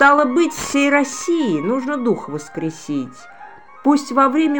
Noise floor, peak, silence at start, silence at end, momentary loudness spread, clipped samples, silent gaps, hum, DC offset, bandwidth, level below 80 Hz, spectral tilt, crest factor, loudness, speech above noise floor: -41 dBFS; 0 dBFS; 0 s; 0 s; 11 LU; under 0.1%; none; none; 0.5%; 17 kHz; -56 dBFS; -4.5 dB/octave; 18 dB; -18 LUFS; 24 dB